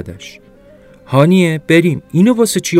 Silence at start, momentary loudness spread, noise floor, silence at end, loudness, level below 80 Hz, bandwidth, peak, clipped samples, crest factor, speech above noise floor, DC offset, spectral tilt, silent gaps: 0 s; 10 LU; -42 dBFS; 0 s; -12 LUFS; -52 dBFS; 15.5 kHz; 0 dBFS; under 0.1%; 14 dB; 30 dB; under 0.1%; -6 dB/octave; none